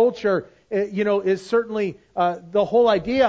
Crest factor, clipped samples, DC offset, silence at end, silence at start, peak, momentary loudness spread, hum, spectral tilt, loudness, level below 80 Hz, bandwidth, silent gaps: 16 dB; under 0.1%; under 0.1%; 0 s; 0 s; -4 dBFS; 8 LU; none; -6.5 dB/octave; -22 LUFS; -54 dBFS; 8 kHz; none